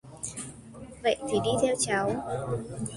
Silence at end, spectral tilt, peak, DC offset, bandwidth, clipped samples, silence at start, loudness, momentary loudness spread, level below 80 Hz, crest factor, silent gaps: 0 s; -4 dB/octave; -12 dBFS; under 0.1%; 11.5 kHz; under 0.1%; 0.05 s; -29 LUFS; 15 LU; -56 dBFS; 18 dB; none